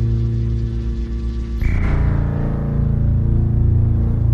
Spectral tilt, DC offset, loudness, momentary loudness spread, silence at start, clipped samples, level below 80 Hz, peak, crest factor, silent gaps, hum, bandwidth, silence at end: -10 dB/octave; under 0.1%; -19 LUFS; 8 LU; 0 s; under 0.1%; -20 dBFS; -6 dBFS; 12 dB; none; none; 5.4 kHz; 0 s